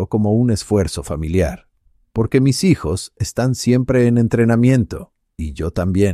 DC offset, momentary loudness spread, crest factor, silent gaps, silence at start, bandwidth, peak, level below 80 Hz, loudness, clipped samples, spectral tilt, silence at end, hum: under 0.1%; 11 LU; 16 dB; none; 0 s; 14 kHz; -2 dBFS; -34 dBFS; -17 LUFS; under 0.1%; -6.5 dB/octave; 0 s; none